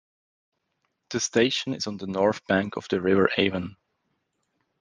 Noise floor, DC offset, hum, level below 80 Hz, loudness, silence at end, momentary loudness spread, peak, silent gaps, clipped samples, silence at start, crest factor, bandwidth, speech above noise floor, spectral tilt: -76 dBFS; under 0.1%; none; -68 dBFS; -25 LUFS; 1.05 s; 10 LU; -4 dBFS; none; under 0.1%; 1.1 s; 22 dB; 10 kHz; 52 dB; -4 dB/octave